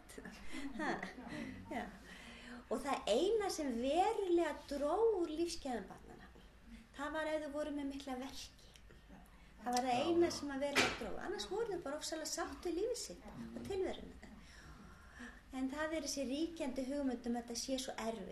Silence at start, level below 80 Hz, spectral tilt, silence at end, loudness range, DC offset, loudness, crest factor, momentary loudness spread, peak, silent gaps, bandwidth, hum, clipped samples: 0 s; -62 dBFS; -3.5 dB/octave; 0 s; 8 LU; under 0.1%; -40 LUFS; 22 dB; 21 LU; -18 dBFS; none; 13.5 kHz; none; under 0.1%